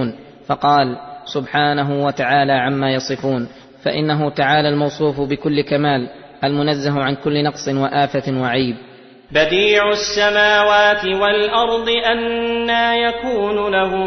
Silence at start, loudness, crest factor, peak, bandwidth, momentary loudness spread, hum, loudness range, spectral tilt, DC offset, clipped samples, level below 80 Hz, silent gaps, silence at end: 0 s; -17 LUFS; 16 dB; -2 dBFS; 6.4 kHz; 9 LU; none; 4 LU; -5 dB/octave; under 0.1%; under 0.1%; -48 dBFS; none; 0 s